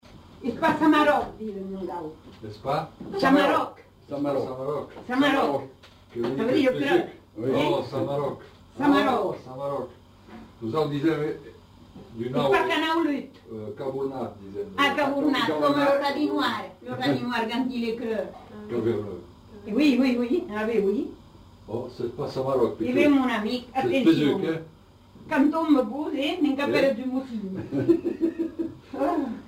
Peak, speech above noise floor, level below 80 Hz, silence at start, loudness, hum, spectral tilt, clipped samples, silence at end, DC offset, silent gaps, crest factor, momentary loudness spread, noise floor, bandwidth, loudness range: -8 dBFS; 26 dB; -58 dBFS; 0.15 s; -25 LUFS; none; -6 dB/octave; under 0.1%; 0 s; under 0.1%; none; 18 dB; 15 LU; -51 dBFS; 16 kHz; 3 LU